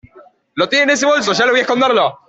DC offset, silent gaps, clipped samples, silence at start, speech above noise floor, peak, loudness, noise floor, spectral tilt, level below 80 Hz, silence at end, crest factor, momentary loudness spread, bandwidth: under 0.1%; none; under 0.1%; 0.15 s; 32 dB; -2 dBFS; -13 LUFS; -46 dBFS; -2.5 dB/octave; -58 dBFS; 0.15 s; 12 dB; 5 LU; 8.2 kHz